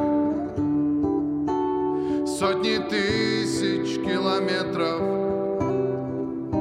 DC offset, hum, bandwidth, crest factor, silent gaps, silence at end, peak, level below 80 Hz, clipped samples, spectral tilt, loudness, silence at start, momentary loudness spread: under 0.1%; none; 13 kHz; 14 dB; none; 0 s; -10 dBFS; -52 dBFS; under 0.1%; -5.5 dB/octave; -24 LUFS; 0 s; 3 LU